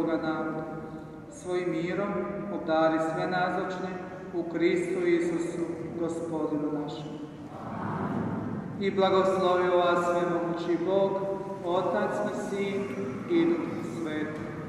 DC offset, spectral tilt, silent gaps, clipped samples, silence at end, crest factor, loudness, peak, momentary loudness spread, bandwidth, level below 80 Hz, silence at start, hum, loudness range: under 0.1%; -6.5 dB/octave; none; under 0.1%; 0 s; 18 dB; -29 LUFS; -10 dBFS; 12 LU; 11.5 kHz; -62 dBFS; 0 s; none; 5 LU